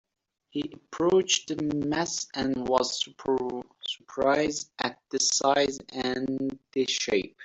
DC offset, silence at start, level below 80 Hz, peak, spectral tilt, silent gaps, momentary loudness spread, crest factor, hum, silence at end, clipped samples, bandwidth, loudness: under 0.1%; 0.55 s; -60 dBFS; -8 dBFS; -3 dB/octave; none; 12 LU; 20 dB; none; 0 s; under 0.1%; 8.2 kHz; -28 LUFS